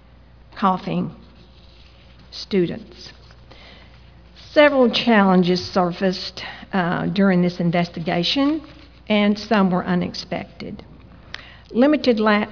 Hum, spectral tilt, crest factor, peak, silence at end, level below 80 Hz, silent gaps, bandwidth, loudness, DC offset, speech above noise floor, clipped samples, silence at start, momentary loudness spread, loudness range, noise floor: none; -6.5 dB/octave; 18 dB; -2 dBFS; 0 s; -50 dBFS; none; 5.4 kHz; -19 LUFS; 0.1%; 28 dB; under 0.1%; 0.55 s; 20 LU; 8 LU; -47 dBFS